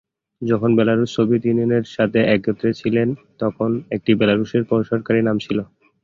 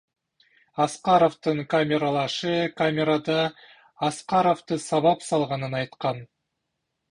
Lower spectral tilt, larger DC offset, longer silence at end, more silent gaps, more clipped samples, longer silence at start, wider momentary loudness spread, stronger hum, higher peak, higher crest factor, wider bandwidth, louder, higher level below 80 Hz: first, -7.5 dB/octave vs -5.5 dB/octave; neither; second, 0.4 s vs 0.85 s; neither; neither; second, 0.4 s vs 0.75 s; about the same, 8 LU vs 9 LU; neither; first, -2 dBFS vs -8 dBFS; about the same, 16 dB vs 18 dB; second, 7.2 kHz vs 11 kHz; first, -19 LUFS vs -24 LUFS; first, -54 dBFS vs -64 dBFS